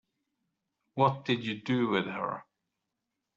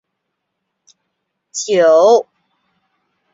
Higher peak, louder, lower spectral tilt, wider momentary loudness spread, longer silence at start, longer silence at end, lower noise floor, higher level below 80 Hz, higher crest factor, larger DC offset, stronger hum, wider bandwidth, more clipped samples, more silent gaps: second, -12 dBFS vs -2 dBFS; second, -30 LUFS vs -12 LUFS; first, -4.5 dB/octave vs -3 dB/octave; second, 11 LU vs 15 LU; second, 0.95 s vs 1.55 s; second, 0.95 s vs 1.1 s; first, -85 dBFS vs -74 dBFS; second, -74 dBFS vs -66 dBFS; first, 22 dB vs 16 dB; neither; neither; about the same, 7.6 kHz vs 7.8 kHz; neither; neither